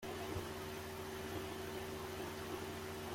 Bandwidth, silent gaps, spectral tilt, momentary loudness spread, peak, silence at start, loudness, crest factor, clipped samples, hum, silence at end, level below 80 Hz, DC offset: 16.5 kHz; none; -4.5 dB/octave; 2 LU; -30 dBFS; 0 s; -45 LUFS; 16 dB; under 0.1%; none; 0 s; -64 dBFS; under 0.1%